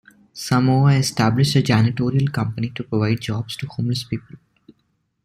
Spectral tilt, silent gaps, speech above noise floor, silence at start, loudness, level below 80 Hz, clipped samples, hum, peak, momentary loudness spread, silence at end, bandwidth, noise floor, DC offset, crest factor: -6 dB/octave; none; 49 dB; 0.35 s; -20 LUFS; -52 dBFS; under 0.1%; none; -4 dBFS; 12 LU; 0.9 s; 14.5 kHz; -68 dBFS; under 0.1%; 16 dB